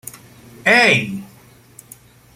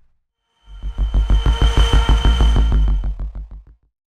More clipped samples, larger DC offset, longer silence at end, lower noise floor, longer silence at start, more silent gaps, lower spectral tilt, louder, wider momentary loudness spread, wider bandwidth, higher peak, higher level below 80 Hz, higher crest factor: neither; neither; first, 1.1 s vs 0.55 s; second, -47 dBFS vs -66 dBFS; about the same, 0.65 s vs 0.7 s; neither; second, -3.5 dB/octave vs -5.5 dB/octave; first, -13 LUFS vs -18 LUFS; first, 21 LU vs 17 LU; first, 16.5 kHz vs 9.6 kHz; first, 0 dBFS vs -4 dBFS; second, -60 dBFS vs -16 dBFS; first, 20 dB vs 14 dB